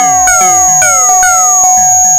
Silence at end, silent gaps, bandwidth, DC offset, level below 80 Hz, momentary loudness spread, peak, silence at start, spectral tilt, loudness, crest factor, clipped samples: 0 s; none; over 20 kHz; under 0.1%; -36 dBFS; 1 LU; 0 dBFS; 0 s; 0 dB/octave; -4 LUFS; 6 dB; 1%